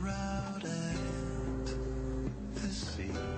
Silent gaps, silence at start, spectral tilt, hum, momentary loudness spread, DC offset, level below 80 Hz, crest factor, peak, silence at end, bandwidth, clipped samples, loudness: none; 0 s; -5.5 dB/octave; none; 2 LU; under 0.1%; -42 dBFS; 12 dB; -24 dBFS; 0 s; 8.4 kHz; under 0.1%; -38 LUFS